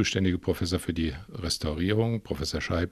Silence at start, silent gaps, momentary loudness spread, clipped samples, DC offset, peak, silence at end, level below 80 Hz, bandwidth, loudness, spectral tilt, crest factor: 0 s; none; 5 LU; under 0.1%; under 0.1%; -10 dBFS; 0 s; -44 dBFS; 14.5 kHz; -29 LUFS; -5 dB/octave; 18 dB